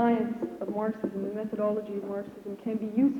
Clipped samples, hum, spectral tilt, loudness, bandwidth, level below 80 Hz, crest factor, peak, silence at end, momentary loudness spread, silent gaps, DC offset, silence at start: under 0.1%; none; -8.5 dB/octave; -32 LUFS; 7 kHz; -68 dBFS; 16 dB; -14 dBFS; 0 s; 9 LU; none; under 0.1%; 0 s